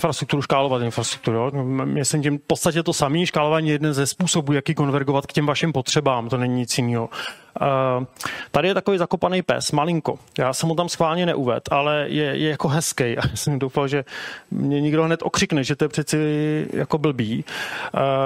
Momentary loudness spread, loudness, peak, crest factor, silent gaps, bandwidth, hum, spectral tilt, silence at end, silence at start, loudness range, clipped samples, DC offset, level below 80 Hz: 5 LU; -22 LUFS; -4 dBFS; 16 dB; none; 16 kHz; none; -5 dB/octave; 0 s; 0 s; 2 LU; under 0.1%; under 0.1%; -52 dBFS